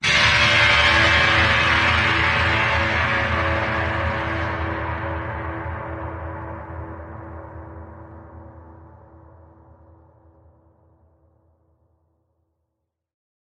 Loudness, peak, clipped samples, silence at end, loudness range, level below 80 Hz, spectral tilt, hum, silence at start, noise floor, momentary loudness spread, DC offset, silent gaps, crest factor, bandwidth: -18 LUFS; -4 dBFS; under 0.1%; 4.6 s; 23 LU; -36 dBFS; -4 dB/octave; none; 0 s; -79 dBFS; 23 LU; under 0.1%; none; 18 dB; 10.5 kHz